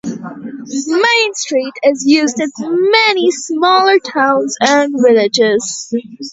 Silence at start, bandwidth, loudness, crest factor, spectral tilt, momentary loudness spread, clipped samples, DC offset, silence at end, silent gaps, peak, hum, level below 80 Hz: 0.05 s; 8 kHz; -12 LUFS; 14 dB; -2.5 dB/octave; 12 LU; under 0.1%; under 0.1%; 0 s; none; 0 dBFS; none; -62 dBFS